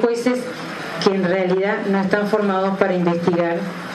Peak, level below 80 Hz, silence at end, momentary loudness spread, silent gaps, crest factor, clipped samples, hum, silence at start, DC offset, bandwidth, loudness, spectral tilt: -2 dBFS; -64 dBFS; 0 s; 7 LU; none; 18 dB; under 0.1%; none; 0 s; under 0.1%; 12.5 kHz; -20 LUFS; -6.5 dB/octave